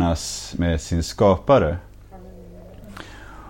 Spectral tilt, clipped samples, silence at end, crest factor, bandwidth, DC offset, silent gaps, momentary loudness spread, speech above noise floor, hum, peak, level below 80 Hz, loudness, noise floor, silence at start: -6 dB/octave; under 0.1%; 0 s; 18 dB; 16.5 kHz; under 0.1%; none; 25 LU; 22 dB; 50 Hz at -45 dBFS; -4 dBFS; -36 dBFS; -20 LUFS; -42 dBFS; 0 s